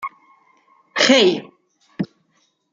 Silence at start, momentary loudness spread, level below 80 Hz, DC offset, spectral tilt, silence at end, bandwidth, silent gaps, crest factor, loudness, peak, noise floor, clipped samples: 0 s; 17 LU; -68 dBFS; under 0.1%; -3 dB/octave; 0.65 s; 9.2 kHz; none; 20 dB; -17 LUFS; 0 dBFS; -65 dBFS; under 0.1%